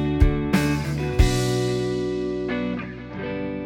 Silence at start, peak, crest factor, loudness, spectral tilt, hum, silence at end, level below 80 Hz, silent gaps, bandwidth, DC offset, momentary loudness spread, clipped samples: 0 s; -2 dBFS; 20 dB; -24 LUFS; -6 dB/octave; none; 0 s; -28 dBFS; none; 17 kHz; under 0.1%; 10 LU; under 0.1%